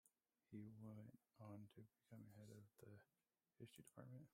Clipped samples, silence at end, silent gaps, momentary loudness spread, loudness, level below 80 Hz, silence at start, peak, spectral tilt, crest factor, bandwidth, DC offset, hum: under 0.1%; 0.05 s; none; 7 LU; -64 LUFS; under -90 dBFS; 0.05 s; -44 dBFS; -7 dB/octave; 18 dB; 15.5 kHz; under 0.1%; none